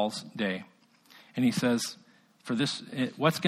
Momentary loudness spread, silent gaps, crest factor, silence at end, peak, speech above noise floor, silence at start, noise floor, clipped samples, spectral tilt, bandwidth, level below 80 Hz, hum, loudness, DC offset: 12 LU; none; 20 dB; 0 s; -10 dBFS; 29 dB; 0 s; -58 dBFS; under 0.1%; -4.5 dB/octave; 15 kHz; -72 dBFS; none; -30 LUFS; under 0.1%